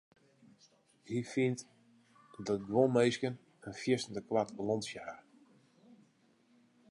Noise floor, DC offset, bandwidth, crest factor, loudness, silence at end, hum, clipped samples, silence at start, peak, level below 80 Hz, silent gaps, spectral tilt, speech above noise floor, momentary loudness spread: -70 dBFS; under 0.1%; 11.5 kHz; 22 dB; -35 LUFS; 1.7 s; none; under 0.1%; 1.05 s; -16 dBFS; -74 dBFS; none; -5.5 dB/octave; 36 dB; 17 LU